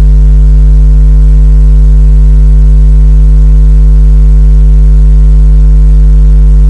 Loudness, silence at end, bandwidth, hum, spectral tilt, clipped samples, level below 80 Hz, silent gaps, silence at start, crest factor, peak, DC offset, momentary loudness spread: -6 LUFS; 0 s; 1.5 kHz; none; -9.5 dB/octave; 0.5%; -2 dBFS; none; 0 s; 2 dB; 0 dBFS; 0.2%; 0 LU